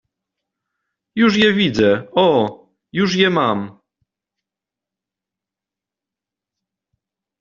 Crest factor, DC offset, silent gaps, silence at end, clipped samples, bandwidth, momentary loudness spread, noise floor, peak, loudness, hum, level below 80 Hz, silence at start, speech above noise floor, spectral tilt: 18 dB; under 0.1%; none; 3.7 s; under 0.1%; 7.4 kHz; 12 LU; -87 dBFS; -2 dBFS; -16 LUFS; none; -56 dBFS; 1.15 s; 72 dB; -3.5 dB/octave